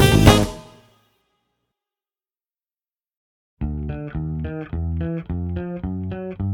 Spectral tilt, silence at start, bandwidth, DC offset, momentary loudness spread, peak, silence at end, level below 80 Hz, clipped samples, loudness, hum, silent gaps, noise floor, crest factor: -5.5 dB/octave; 0 s; 19.5 kHz; under 0.1%; 15 LU; 0 dBFS; 0 s; -32 dBFS; under 0.1%; -22 LUFS; none; 3.17-3.57 s; under -90 dBFS; 22 dB